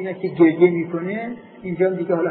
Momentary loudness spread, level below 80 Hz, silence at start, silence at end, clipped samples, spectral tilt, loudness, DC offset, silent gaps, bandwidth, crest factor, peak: 16 LU; -64 dBFS; 0 s; 0 s; under 0.1%; -12 dB/octave; -19 LUFS; under 0.1%; none; 4.5 kHz; 16 dB; -2 dBFS